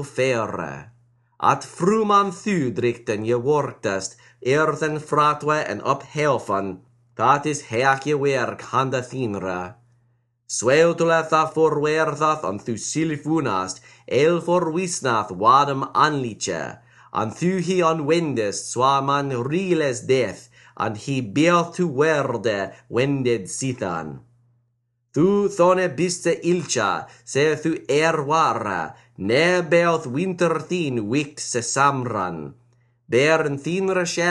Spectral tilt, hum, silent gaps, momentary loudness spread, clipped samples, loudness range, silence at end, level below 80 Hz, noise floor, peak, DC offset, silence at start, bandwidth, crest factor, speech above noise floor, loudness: -5 dB/octave; none; none; 10 LU; under 0.1%; 2 LU; 0 s; -62 dBFS; -70 dBFS; -2 dBFS; under 0.1%; 0 s; 11.5 kHz; 18 dB; 49 dB; -21 LUFS